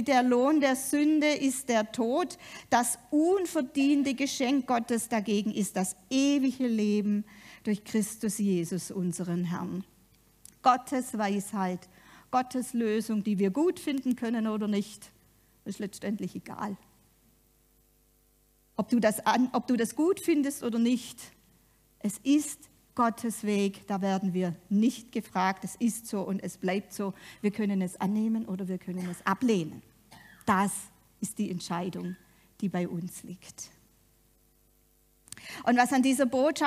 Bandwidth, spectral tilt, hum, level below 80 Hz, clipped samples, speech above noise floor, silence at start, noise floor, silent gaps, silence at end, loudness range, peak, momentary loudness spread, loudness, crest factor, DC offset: 15.5 kHz; -5 dB/octave; none; -70 dBFS; under 0.1%; 37 dB; 0 s; -66 dBFS; none; 0 s; 8 LU; -8 dBFS; 13 LU; -29 LUFS; 20 dB; under 0.1%